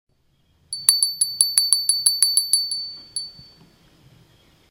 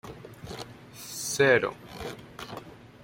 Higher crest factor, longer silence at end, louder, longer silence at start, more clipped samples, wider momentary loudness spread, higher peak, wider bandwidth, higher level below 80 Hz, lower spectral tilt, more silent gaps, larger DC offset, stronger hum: about the same, 24 dB vs 22 dB; first, 1.3 s vs 0 s; first, -17 LUFS vs -26 LUFS; first, 0.7 s vs 0.05 s; neither; second, 15 LU vs 22 LU; first, 0 dBFS vs -8 dBFS; about the same, 17 kHz vs 16.5 kHz; second, -64 dBFS vs -58 dBFS; second, 3.5 dB/octave vs -3.5 dB/octave; neither; neither; neither